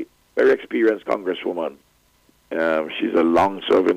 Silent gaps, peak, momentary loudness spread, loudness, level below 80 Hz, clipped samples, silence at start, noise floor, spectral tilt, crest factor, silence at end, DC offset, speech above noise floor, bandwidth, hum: none; -8 dBFS; 11 LU; -21 LUFS; -58 dBFS; under 0.1%; 0 s; -59 dBFS; -6 dB/octave; 12 dB; 0 s; under 0.1%; 40 dB; 10 kHz; none